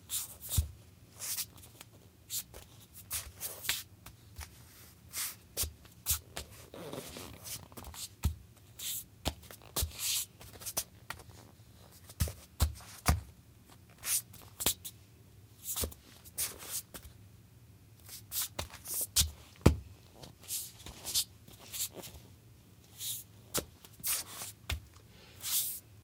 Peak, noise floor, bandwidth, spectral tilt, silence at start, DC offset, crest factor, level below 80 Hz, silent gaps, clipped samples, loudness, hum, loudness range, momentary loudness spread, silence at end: -4 dBFS; -58 dBFS; 18 kHz; -2.5 dB/octave; 0 s; under 0.1%; 36 dB; -48 dBFS; none; under 0.1%; -36 LUFS; none; 6 LU; 22 LU; 0 s